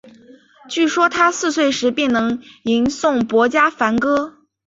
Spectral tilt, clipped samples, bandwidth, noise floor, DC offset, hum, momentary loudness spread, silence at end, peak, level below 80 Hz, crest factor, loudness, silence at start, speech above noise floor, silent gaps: -3.5 dB/octave; under 0.1%; 8 kHz; -46 dBFS; under 0.1%; none; 7 LU; 0.4 s; -2 dBFS; -56 dBFS; 16 dB; -17 LUFS; 0.65 s; 30 dB; none